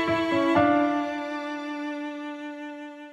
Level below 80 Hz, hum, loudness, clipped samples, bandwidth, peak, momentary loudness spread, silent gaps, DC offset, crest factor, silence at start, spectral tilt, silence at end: -62 dBFS; none; -26 LUFS; under 0.1%; 9.2 kHz; -8 dBFS; 16 LU; none; under 0.1%; 18 dB; 0 s; -6 dB/octave; 0 s